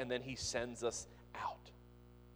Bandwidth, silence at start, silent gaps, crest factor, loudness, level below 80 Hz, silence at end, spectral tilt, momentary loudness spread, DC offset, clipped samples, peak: over 20 kHz; 0 s; none; 20 dB; -43 LUFS; -62 dBFS; 0 s; -3 dB/octave; 22 LU; under 0.1%; under 0.1%; -24 dBFS